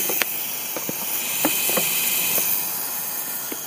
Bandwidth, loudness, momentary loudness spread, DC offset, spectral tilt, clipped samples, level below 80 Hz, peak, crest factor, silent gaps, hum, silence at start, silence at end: 16 kHz; -21 LUFS; 7 LU; under 0.1%; -0.5 dB/octave; under 0.1%; -68 dBFS; 0 dBFS; 24 dB; none; none; 0 s; 0 s